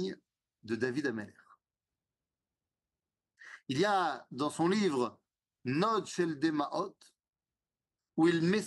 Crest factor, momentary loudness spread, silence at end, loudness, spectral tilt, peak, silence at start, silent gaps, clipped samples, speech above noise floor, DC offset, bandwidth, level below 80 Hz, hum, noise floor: 18 dB; 14 LU; 0 s; -33 LUFS; -5.5 dB/octave; -16 dBFS; 0 s; none; under 0.1%; over 58 dB; under 0.1%; 11.5 kHz; -78 dBFS; none; under -90 dBFS